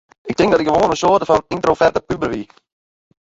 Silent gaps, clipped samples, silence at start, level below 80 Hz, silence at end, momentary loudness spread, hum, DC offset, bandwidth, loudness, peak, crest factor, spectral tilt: none; under 0.1%; 0.25 s; -44 dBFS; 0.8 s; 9 LU; none; under 0.1%; 8 kHz; -16 LUFS; -2 dBFS; 16 dB; -5.5 dB/octave